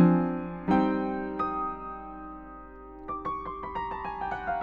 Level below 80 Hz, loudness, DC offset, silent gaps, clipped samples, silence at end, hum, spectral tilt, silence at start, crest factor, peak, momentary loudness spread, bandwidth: -50 dBFS; -31 LUFS; under 0.1%; none; under 0.1%; 0 s; none; -10 dB/octave; 0 s; 20 dB; -10 dBFS; 18 LU; 5 kHz